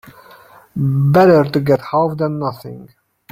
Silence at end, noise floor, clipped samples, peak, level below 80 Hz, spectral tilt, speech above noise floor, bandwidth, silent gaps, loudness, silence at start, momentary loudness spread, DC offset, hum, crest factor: 0.45 s; -44 dBFS; under 0.1%; -2 dBFS; -52 dBFS; -8.5 dB/octave; 29 dB; 15.5 kHz; none; -15 LUFS; 0.75 s; 18 LU; under 0.1%; none; 14 dB